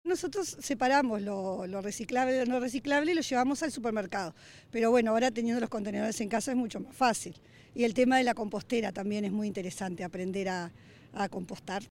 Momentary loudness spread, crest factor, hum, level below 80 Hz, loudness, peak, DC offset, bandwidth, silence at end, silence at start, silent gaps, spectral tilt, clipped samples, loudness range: 11 LU; 16 dB; none; -66 dBFS; -31 LUFS; -14 dBFS; under 0.1%; 16.5 kHz; 0.05 s; 0.05 s; none; -4.5 dB/octave; under 0.1%; 2 LU